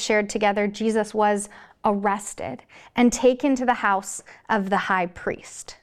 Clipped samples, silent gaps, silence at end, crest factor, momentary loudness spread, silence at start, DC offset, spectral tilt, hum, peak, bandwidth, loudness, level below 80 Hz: under 0.1%; none; 0.1 s; 16 dB; 14 LU; 0 s; under 0.1%; -4 dB/octave; none; -8 dBFS; 14 kHz; -23 LUFS; -54 dBFS